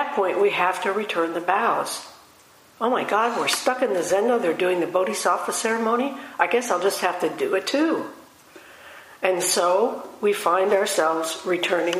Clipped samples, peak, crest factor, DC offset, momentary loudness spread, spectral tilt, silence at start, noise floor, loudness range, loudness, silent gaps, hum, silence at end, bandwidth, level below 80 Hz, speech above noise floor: under 0.1%; -4 dBFS; 20 dB; under 0.1%; 6 LU; -2.5 dB/octave; 0 s; -52 dBFS; 2 LU; -22 LUFS; none; none; 0 s; 15.5 kHz; -72 dBFS; 30 dB